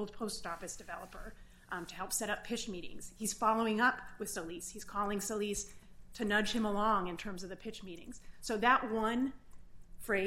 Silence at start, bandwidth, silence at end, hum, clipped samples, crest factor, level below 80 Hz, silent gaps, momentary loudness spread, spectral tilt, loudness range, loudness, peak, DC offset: 0 s; 16 kHz; 0 s; none; under 0.1%; 22 dB; -56 dBFS; none; 17 LU; -3 dB/octave; 3 LU; -36 LUFS; -14 dBFS; under 0.1%